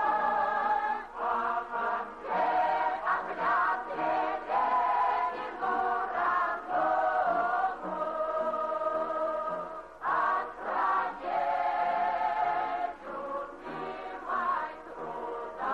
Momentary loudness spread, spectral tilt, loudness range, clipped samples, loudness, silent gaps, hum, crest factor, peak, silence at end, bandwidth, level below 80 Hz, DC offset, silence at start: 10 LU; -5 dB/octave; 3 LU; under 0.1%; -30 LUFS; none; none; 12 dB; -18 dBFS; 0 s; 8.6 kHz; -66 dBFS; under 0.1%; 0 s